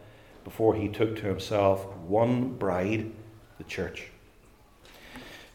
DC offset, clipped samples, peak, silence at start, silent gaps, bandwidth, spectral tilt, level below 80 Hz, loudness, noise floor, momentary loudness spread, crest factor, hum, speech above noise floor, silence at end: under 0.1%; under 0.1%; -10 dBFS; 0 s; none; 17 kHz; -7 dB/octave; -58 dBFS; -28 LUFS; -57 dBFS; 21 LU; 20 dB; none; 30 dB; 0.1 s